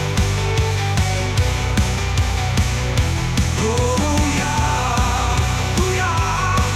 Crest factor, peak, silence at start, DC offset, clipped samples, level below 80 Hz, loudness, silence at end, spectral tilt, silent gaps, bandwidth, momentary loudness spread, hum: 12 dB; -6 dBFS; 0 s; under 0.1%; under 0.1%; -24 dBFS; -19 LUFS; 0 s; -4.5 dB/octave; none; 15.5 kHz; 2 LU; none